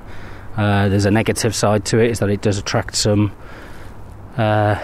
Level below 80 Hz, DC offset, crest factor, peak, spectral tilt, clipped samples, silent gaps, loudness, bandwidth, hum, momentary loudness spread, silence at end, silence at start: -38 dBFS; under 0.1%; 14 dB; -4 dBFS; -5 dB/octave; under 0.1%; none; -17 LUFS; 14.5 kHz; none; 21 LU; 0 s; 0 s